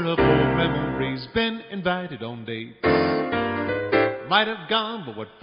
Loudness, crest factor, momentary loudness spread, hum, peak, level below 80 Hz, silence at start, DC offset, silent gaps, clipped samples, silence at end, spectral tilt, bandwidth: -23 LUFS; 20 dB; 13 LU; none; -4 dBFS; -46 dBFS; 0 s; under 0.1%; none; under 0.1%; 0.15 s; -3.5 dB/octave; 5.4 kHz